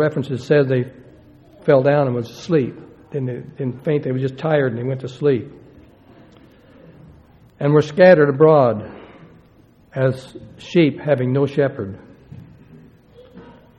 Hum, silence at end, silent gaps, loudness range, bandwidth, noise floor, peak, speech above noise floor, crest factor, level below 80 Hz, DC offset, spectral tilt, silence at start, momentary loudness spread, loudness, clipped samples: none; 0.35 s; none; 7 LU; 8.4 kHz; -51 dBFS; 0 dBFS; 34 dB; 20 dB; -56 dBFS; under 0.1%; -8 dB/octave; 0 s; 18 LU; -18 LUFS; under 0.1%